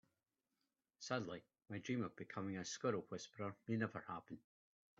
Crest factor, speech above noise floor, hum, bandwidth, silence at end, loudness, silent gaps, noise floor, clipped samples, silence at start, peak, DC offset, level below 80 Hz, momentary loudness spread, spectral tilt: 22 dB; over 44 dB; none; 7.6 kHz; 0.6 s; -46 LUFS; none; under -90 dBFS; under 0.1%; 1 s; -26 dBFS; under 0.1%; -86 dBFS; 11 LU; -5 dB/octave